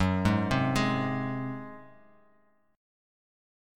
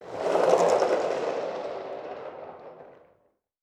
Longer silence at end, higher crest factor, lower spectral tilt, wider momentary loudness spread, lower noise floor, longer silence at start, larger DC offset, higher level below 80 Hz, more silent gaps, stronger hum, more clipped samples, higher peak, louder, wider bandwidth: first, 1.9 s vs 0.7 s; about the same, 20 dB vs 22 dB; first, -6.5 dB/octave vs -4 dB/octave; second, 17 LU vs 21 LU; about the same, -68 dBFS vs -69 dBFS; about the same, 0 s vs 0 s; neither; first, -50 dBFS vs -72 dBFS; neither; neither; neither; second, -12 dBFS vs -6 dBFS; second, -29 LUFS vs -26 LUFS; first, 17 kHz vs 13 kHz